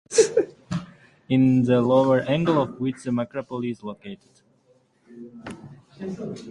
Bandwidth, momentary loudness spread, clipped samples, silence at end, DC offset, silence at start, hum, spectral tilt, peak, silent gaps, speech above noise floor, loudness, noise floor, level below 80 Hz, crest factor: 11.5 kHz; 22 LU; under 0.1%; 0 s; under 0.1%; 0.1 s; none; -6 dB/octave; -4 dBFS; none; 39 dB; -23 LUFS; -62 dBFS; -60 dBFS; 20 dB